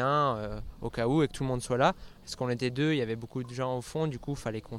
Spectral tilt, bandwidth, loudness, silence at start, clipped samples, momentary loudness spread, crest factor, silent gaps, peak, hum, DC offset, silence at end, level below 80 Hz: -6 dB/octave; 14.5 kHz; -31 LUFS; 0 s; under 0.1%; 11 LU; 20 dB; none; -10 dBFS; none; under 0.1%; 0 s; -50 dBFS